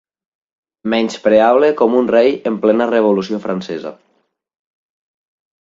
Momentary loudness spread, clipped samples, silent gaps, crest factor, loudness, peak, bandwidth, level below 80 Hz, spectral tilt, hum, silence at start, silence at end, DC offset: 13 LU; under 0.1%; none; 16 dB; -14 LUFS; 0 dBFS; 7.8 kHz; -58 dBFS; -6 dB/octave; none; 0.85 s; 1.7 s; under 0.1%